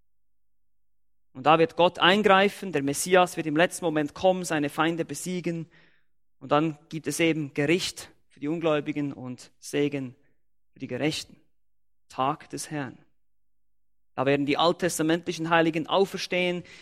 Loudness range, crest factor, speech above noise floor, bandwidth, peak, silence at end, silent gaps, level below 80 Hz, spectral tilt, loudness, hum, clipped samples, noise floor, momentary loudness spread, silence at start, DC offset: 11 LU; 22 dB; 59 dB; 16 kHz; -4 dBFS; 0.05 s; none; -66 dBFS; -4.5 dB/octave; -25 LUFS; none; under 0.1%; -84 dBFS; 16 LU; 1.35 s; under 0.1%